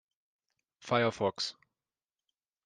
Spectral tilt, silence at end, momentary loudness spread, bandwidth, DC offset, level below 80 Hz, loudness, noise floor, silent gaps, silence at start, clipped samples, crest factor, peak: -4.5 dB/octave; 1.15 s; 10 LU; 9.8 kHz; under 0.1%; -78 dBFS; -32 LUFS; under -90 dBFS; none; 0.8 s; under 0.1%; 24 dB; -12 dBFS